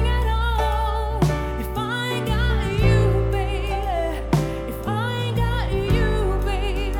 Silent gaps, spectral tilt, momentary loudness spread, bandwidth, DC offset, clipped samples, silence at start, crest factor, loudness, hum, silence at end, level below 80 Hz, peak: none; -6.5 dB/octave; 6 LU; 17 kHz; under 0.1%; under 0.1%; 0 s; 16 dB; -23 LUFS; none; 0 s; -24 dBFS; -4 dBFS